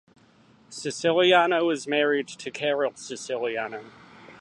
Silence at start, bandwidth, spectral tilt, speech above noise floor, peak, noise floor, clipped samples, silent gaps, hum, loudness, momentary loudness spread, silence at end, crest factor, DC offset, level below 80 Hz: 0.7 s; 11.5 kHz; -3.5 dB/octave; 33 dB; -6 dBFS; -57 dBFS; under 0.1%; none; none; -24 LUFS; 16 LU; 0.05 s; 20 dB; under 0.1%; -74 dBFS